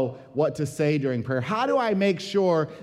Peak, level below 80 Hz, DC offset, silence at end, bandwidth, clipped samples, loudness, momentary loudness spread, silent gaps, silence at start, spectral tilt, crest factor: -10 dBFS; -64 dBFS; under 0.1%; 0 s; 14 kHz; under 0.1%; -25 LUFS; 4 LU; none; 0 s; -6.5 dB/octave; 14 dB